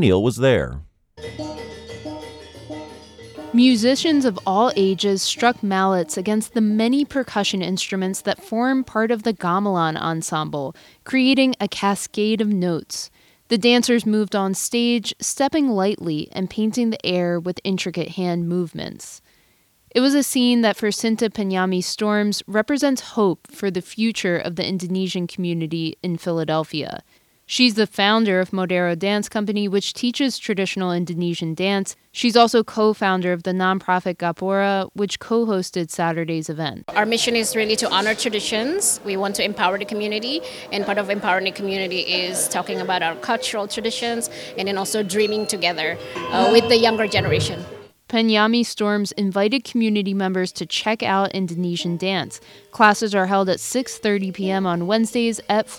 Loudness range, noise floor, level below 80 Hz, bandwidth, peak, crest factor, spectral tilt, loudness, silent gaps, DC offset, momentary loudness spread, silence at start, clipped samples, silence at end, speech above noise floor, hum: 4 LU; -59 dBFS; -54 dBFS; 17.5 kHz; -2 dBFS; 20 dB; -4 dB/octave; -20 LUFS; none; under 0.1%; 10 LU; 0 s; under 0.1%; 0 s; 39 dB; none